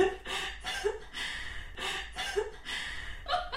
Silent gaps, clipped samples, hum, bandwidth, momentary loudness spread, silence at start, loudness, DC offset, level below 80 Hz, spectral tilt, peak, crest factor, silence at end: none; under 0.1%; none; 16 kHz; 5 LU; 0 s; -35 LUFS; 0.3%; -48 dBFS; -2.5 dB/octave; -14 dBFS; 20 dB; 0 s